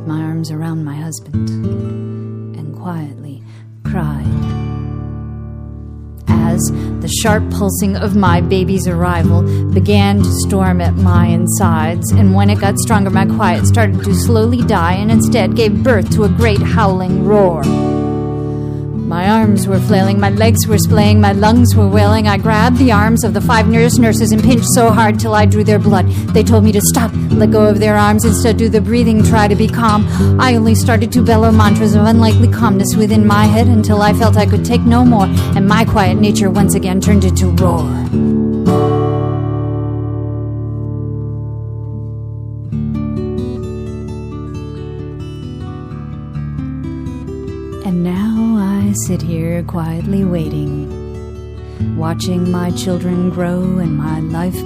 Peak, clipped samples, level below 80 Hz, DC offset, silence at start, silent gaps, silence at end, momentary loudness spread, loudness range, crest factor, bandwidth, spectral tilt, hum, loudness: 0 dBFS; under 0.1%; -30 dBFS; under 0.1%; 0 s; none; 0 s; 15 LU; 12 LU; 12 dB; 15.5 kHz; -6.5 dB/octave; none; -12 LUFS